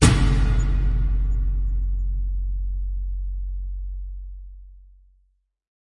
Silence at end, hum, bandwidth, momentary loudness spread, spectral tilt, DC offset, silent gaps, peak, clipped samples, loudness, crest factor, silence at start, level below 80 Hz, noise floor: 1.2 s; none; 11.5 kHz; 16 LU; -5.5 dB/octave; under 0.1%; none; -2 dBFS; under 0.1%; -26 LUFS; 20 dB; 0 s; -24 dBFS; -66 dBFS